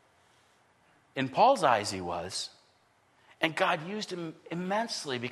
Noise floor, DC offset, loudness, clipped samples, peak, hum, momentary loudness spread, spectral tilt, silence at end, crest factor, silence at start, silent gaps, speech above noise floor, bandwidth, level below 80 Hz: -67 dBFS; under 0.1%; -30 LUFS; under 0.1%; -10 dBFS; none; 14 LU; -4 dB/octave; 0 s; 22 dB; 1.15 s; none; 37 dB; 12.5 kHz; -72 dBFS